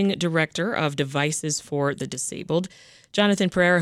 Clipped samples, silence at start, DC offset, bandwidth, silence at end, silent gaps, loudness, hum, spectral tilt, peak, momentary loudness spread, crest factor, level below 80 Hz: under 0.1%; 0 s; under 0.1%; 14 kHz; 0 s; none; -24 LUFS; none; -4.5 dB/octave; -6 dBFS; 8 LU; 18 dB; -60 dBFS